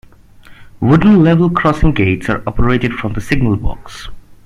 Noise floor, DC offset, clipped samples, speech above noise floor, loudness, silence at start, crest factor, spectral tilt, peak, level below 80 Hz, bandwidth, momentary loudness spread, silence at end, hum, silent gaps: -39 dBFS; under 0.1%; under 0.1%; 27 dB; -13 LUFS; 0.5 s; 14 dB; -8 dB/octave; 0 dBFS; -24 dBFS; 11.5 kHz; 15 LU; 0.1 s; none; none